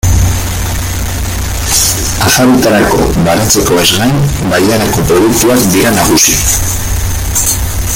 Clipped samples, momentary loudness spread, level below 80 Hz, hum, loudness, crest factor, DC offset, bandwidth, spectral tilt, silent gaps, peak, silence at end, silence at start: 0.1%; 8 LU; -20 dBFS; none; -9 LUFS; 10 dB; under 0.1%; over 20 kHz; -3.5 dB/octave; none; 0 dBFS; 0 s; 0.05 s